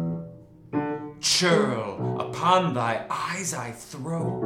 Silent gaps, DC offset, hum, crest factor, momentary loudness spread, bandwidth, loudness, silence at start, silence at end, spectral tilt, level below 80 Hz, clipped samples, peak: none; under 0.1%; none; 20 dB; 13 LU; 16.5 kHz; -25 LUFS; 0 s; 0 s; -4 dB/octave; -62 dBFS; under 0.1%; -6 dBFS